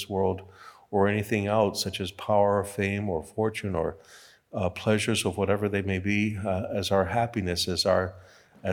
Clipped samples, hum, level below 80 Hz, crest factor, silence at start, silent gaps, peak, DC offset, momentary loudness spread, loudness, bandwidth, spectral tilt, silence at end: under 0.1%; none; -60 dBFS; 18 dB; 0 s; none; -8 dBFS; under 0.1%; 7 LU; -27 LUFS; 18.5 kHz; -5 dB/octave; 0 s